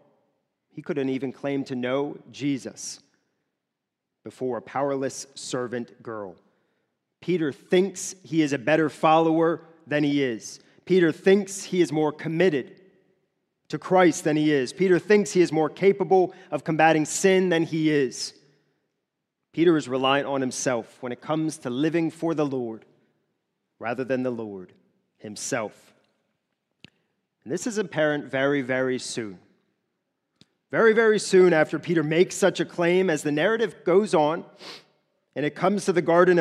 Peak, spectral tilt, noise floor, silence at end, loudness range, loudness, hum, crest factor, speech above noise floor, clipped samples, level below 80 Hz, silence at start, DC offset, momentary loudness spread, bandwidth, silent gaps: -4 dBFS; -5 dB/octave; -83 dBFS; 0 s; 11 LU; -24 LUFS; none; 20 dB; 60 dB; under 0.1%; -76 dBFS; 0.75 s; under 0.1%; 16 LU; 13 kHz; none